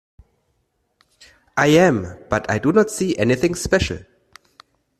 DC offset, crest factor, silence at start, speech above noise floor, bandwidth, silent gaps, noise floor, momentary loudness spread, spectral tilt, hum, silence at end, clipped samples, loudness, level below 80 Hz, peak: under 0.1%; 18 dB; 1.55 s; 51 dB; 14 kHz; none; -68 dBFS; 11 LU; -5 dB/octave; none; 1 s; under 0.1%; -18 LUFS; -44 dBFS; -2 dBFS